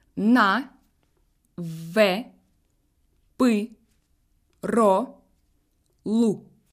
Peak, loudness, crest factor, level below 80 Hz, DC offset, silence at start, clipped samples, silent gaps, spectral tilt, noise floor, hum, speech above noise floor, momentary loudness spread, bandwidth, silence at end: -6 dBFS; -23 LUFS; 20 dB; -66 dBFS; under 0.1%; 0.15 s; under 0.1%; none; -5.5 dB/octave; -67 dBFS; none; 46 dB; 18 LU; 15 kHz; 0.3 s